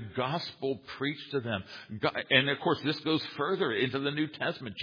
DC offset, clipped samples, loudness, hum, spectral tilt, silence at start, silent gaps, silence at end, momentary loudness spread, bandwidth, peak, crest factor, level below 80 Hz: under 0.1%; under 0.1%; -31 LUFS; none; -6.5 dB/octave; 0 s; none; 0 s; 10 LU; 5.2 kHz; -8 dBFS; 24 dB; -70 dBFS